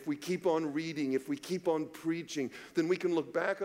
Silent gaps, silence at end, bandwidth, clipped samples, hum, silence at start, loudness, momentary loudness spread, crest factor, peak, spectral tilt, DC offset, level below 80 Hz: none; 0 s; 16 kHz; under 0.1%; none; 0 s; -34 LUFS; 5 LU; 16 dB; -18 dBFS; -5.5 dB/octave; under 0.1%; -78 dBFS